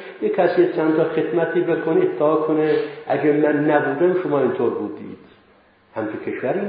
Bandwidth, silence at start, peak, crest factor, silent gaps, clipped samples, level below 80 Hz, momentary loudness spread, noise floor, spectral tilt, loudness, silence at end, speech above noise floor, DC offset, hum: 5 kHz; 0 s; -4 dBFS; 16 dB; none; under 0.1%; -68 dBFS; 11 LU; -54 dBFS; -12 dB/octave; -20 LUFS; 0 s; 35 dB; under 0.1%; none